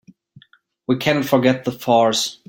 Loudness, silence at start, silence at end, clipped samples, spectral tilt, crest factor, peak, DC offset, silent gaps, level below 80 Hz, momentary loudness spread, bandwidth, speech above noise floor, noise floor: -18 LUFS; 0.9 s; 0.15 s; under 0.1%; -4.5 dB/octave; 18 dB; -2 dBFS; under 0.1%; none; -60 dBFS; 8 LU; 17 kHz; 37 dB; -55 dBFS